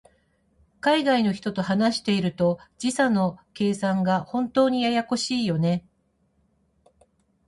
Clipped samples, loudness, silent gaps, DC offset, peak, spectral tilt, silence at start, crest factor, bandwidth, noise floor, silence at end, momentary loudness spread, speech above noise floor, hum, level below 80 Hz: under 0.1%; -24 LUFS; none; under 0.1%; -8 dBFS; -5.5 dB/octave; 0.85 s; 16 dB; 11.5 kHz; -68 dBFS; 1.7 s; 6 LU; 45 dB; none; -62 dBFS